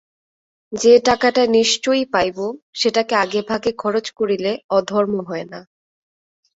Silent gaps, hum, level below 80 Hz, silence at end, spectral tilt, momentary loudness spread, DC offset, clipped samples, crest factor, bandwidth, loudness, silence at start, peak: 2.62-2.73 s, 4.64-4.69 s; none; -56 dBFS; 0.95 s; -3.5 dB/octave; 14 LU; under 0.1%; under 0.1%; 18 dB; 8 kHz; -18 LUFS; 0.7 s; -2 dBFS